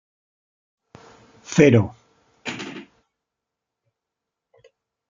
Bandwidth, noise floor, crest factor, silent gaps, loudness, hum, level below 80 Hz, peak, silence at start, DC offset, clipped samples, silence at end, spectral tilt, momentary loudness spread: 7.6 kHz; -84 dBFS; 24 dB; none; -19 LUFS; none; -60 dBFS; -2 dBFS; 1.5 s; under 0.1%; under 0.1%; 2.3 s; -6.5 dB/octave; 21 LU